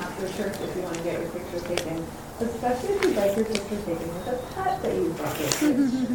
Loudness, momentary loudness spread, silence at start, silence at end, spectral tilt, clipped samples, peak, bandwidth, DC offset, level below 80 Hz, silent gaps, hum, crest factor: -27 LUFS; 9 LU; 0 s; 0 s; -4.5 dB/octave; under 0.1%; -2 dBFS; 17.5 kHz; 0.1%; -48 dBFS; none; none; 26 dB